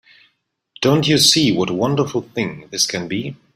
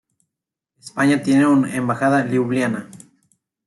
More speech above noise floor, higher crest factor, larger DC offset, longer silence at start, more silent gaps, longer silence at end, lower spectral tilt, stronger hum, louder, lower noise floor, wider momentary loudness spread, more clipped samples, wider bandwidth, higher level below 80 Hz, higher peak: second, 49 dB vs 67 dB; about the same, 18 dB vs 14 dB; neither; about the same, 0.8 s vs 0.85 s; neither; second, 0.2 s vs 0.7 s; second, -3.5 dB/octave vs -6.5 dB/octave; neither; about the same, -17 LUFS vs -18 LUFS; second, -67 dBFS vs -84 dBFS; first, 13 LU vs 9 LU; neither; first, 16 kHz vs 12 kHz; first, -54 dBFS vs -64 dBFS; first, 0 dBFS vs -6 dBFS